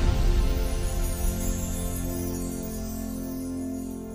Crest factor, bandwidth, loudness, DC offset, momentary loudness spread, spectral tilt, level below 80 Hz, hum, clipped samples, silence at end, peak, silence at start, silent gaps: 16 dB; 16 kHz; -30 LUFS; under 0.1%; 7 LU; -5.5 dB/octave; -28 dBFS; none; under 0.1%; 0 s; -12 dBFS; 0 s; none